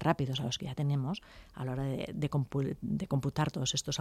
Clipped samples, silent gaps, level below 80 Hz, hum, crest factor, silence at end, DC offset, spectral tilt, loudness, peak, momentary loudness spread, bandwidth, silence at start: under 0.1%; none; -56 dBFS; none; 18 dB; 0 s; under 0.1%; -5 dB/octave; -34 LUFS; -16 dBFS; 7 LU; 14 kHz; 0 s